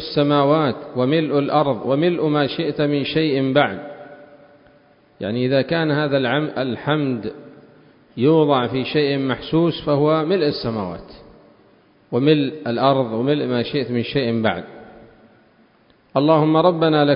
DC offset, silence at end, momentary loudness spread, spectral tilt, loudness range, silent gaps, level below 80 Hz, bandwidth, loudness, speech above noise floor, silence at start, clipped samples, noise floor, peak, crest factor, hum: under 0.1%; 0 s; 10 LU; -11.5 dB/octave; 3 LU; none; -54 dBFS; 5.4 kHz; -19 LUFS; 37 dB; 0 s; under 0.1%; -55 dBFS; -2 dBFS; 18 dB; none